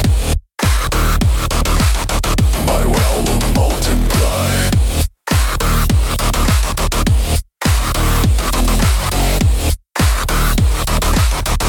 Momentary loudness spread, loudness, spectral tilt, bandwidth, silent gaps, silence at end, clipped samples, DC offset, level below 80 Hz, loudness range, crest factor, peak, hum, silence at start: 3 LU; -16 LUFS; -4.5 dB/octave; 18 kHz; none; 0 s; under 0.1%; under 0.1%; -16 dBFS; 1 LU; 10 dB; -4 dBFS; none; 0 s